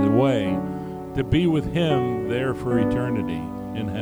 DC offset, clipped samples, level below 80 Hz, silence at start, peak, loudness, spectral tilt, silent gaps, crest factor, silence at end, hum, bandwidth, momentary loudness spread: under 0.1%; under 0.1%; -42 dBFS; 0 s; -6 dBFS; -23 LUFS; -8 dB/octave; none; 16 dB; 0 s; none; over 20 kHz; 10 LU